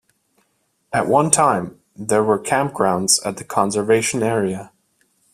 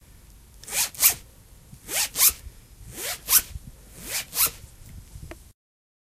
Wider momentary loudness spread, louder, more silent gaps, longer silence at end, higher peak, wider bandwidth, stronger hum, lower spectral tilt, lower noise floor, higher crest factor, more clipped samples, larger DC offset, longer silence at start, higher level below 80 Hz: second, 9 LU vs 25 LU; first, -18 LUFS vs -22 LUFS; neither; about the same, 0.7 s vs 0.7 s; about the same, 0 dBFS vs 0 dBFS; about the same, 15.5 kHz vs 16 kHz; neither; first, -3.5 dB/octave vs 0.5 dB/octave; first, -67 dBFS vs -50 dBFS; second, 20 dB vs 28 dB; neither; neither; first, 0.9 s vs 0.6 s; second, -58 dBFS vs -48 dBFS